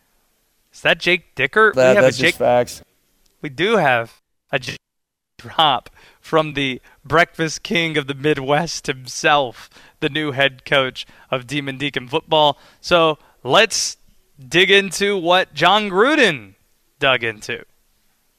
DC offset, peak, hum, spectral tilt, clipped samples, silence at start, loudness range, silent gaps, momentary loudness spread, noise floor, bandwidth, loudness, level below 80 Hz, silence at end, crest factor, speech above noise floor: under 0.1%; -2 dBFS; none; -3.5 dB/octave; under 0.1%; 0.75 s; 5 LU; none; 14 LU; -77 dBFS; 16 kHz; -17 LUFS; -52 dBFS; 0.8 s; 18 dB; 59 dB